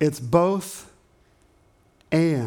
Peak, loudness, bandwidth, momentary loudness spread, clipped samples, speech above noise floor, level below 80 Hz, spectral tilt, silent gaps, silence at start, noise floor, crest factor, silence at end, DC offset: -6 dBFS; -22 LUFS; 19 kHz; 16 LU; under 0.1%; 38 dB; -56 dBFS; -6.5 dB/octave; none; 0 s; -60 dBFS; 20 dB; 0 s; under 0.1%